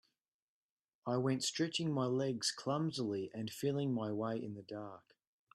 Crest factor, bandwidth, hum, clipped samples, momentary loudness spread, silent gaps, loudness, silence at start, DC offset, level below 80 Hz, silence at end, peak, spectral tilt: 18 dB; 12.5 kHz; none; under 0.1%; 11 LU; none; -38 LUFS; 1.05 s; under 0.1%; -80 dBFS; 0.55 s; -22 dBFS; -5 dB/octave